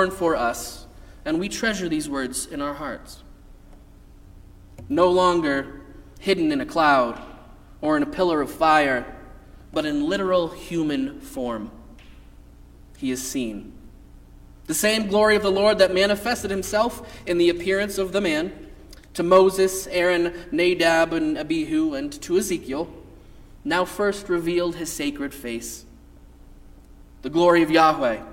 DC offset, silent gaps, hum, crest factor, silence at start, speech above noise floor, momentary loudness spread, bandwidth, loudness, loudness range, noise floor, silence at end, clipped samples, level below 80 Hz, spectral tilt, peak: under 0.1%; none; none; 20 dB; 0 s; 25 dB; 15 LU; 16.5 kHz; -22 LUFS; 8 LU; -47 dBFS; 0 s; under 0.1%; -46 dBFS; -4 dB/octave; -4 dBFS